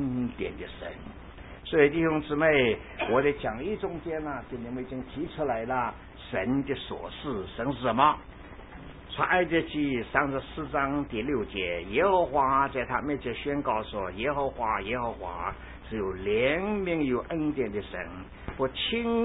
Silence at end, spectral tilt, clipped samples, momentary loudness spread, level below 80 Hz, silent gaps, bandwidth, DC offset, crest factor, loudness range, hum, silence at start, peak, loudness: 0 s; -10 dB/octave; under 0.1%; 16 LU; -48 dBFS; none; 4 kHz; under 0.1%; 22 dB; 5 LU; none; 0 s; -8 dBFS; -29 LUFS